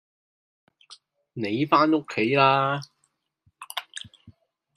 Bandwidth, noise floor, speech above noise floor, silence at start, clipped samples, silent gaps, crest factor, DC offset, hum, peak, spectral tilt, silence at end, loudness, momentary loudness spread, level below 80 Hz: 14.5 kHz; -73 dBFS; 51 dB; 0.9 s; under 0.1%; none; 22 dB; under 0.1%; none; -4 dBFS; -5.5 dB/octave; 0.45 s; -23 LUFS; 21 LU; -72 dBFS